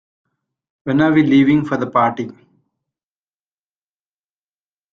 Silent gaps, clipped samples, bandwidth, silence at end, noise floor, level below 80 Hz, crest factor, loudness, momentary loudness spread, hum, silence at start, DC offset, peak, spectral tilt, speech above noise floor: none; under 0.1%; 6.8 kHz; 2.6 s; under -90 dBFS; -58 dBFS; 18 dB; -15 LUFS; 16 LU; 50 Hz at -45 dBFS; 0.85 s; under 0.1%; -2 dBFS; -8 dB/octave; over 75 dB